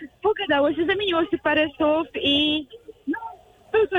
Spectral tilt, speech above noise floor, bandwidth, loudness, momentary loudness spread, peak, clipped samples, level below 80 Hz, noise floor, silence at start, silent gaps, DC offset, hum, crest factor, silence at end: -5.5 dB/octave; 19 dB; 10 kHz; -22 LUFS; 11 LU; -10 dBFS; under 0.1%; -54 dBFS; -41 dBFS; 0 s; none; under 0.1%; none; 14 dB; 0 s